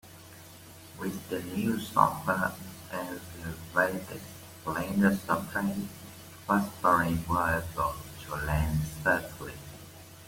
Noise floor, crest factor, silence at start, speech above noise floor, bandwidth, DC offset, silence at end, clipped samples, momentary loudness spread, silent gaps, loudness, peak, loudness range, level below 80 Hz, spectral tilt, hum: -50 dBFS; 24 dB; 0.05 s; 20 dB; 17 kHz; under 0.1%; 0 s; under 0.1%; 20 LU; none; -30 LUFS; -8 dBFS; 3 LU; -48 dBFS; -5.5 dB/octave; none